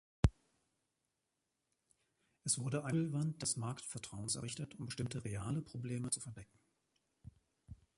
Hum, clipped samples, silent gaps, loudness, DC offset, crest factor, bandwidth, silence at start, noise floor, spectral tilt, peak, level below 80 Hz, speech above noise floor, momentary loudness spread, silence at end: none; under 0.1%; none; -40 LUFS; under 0.1%; 28 dB; 11.5 kHz; 0.25 s; -87 dBFS; -4.5 dB/octave; -14 dBFS; -52 dBFS; 47 dB; 9 LU; 0.25 s